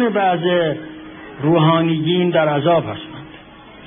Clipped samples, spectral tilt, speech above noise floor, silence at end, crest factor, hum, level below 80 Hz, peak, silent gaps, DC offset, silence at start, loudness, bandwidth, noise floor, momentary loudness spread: under 0.1%; -11 dB/octave; 24 dB; 0 s; 16 dB; none; -54 dBFS; -2 dBFS; none; under 0.1%; 0 s; -16 LUFS; 3.7 kHz; -40 dBFS; 20 LU